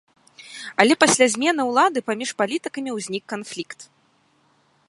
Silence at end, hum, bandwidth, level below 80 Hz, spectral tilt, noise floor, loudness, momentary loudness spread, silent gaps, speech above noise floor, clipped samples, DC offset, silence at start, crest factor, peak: 1.05 s; none; 11.5 kHz; -70 dBFS; -2.5 dB/octave; -62 dBFS; -20 LUFS; 19 LU; none; 41 dB; under 0.1%; under 0.1%; 0.45 s; 22 dB; 0 dBFS